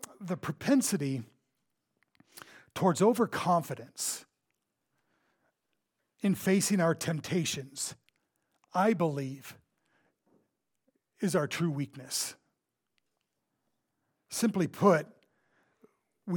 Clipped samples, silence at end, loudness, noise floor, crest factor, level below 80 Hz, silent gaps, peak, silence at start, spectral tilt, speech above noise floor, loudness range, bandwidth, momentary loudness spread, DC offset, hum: under 0.1%; 0 s; -30 LUFS; -83 dBFS; 22 dB; -76 dBFS; none; -10 dBFS; 0.2 s; -5 dB/octave; 53 dB; 5 LU; 19 kHz; 15 LU; under 0.1%; none